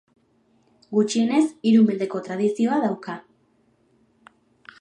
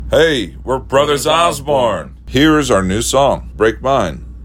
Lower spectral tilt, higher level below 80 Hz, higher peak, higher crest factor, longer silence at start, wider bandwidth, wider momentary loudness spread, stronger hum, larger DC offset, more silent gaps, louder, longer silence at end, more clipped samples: first, -6 dB/octave vs -4.5 dB/octave; second, -76 dBFS vs -30 dBFS; second, -8 dBFS vs 0 dBFS; about the same, 16 dB vs 14 dB; first, 0.9 s vs 0 s; second, 9.6 kHz vs 16.5 kHz; first, 12 LU vs 8 LU; neither; neither; neither; second, -22 LUFS vs -14 LUFS; first, 1.6 s vs 0 s; neither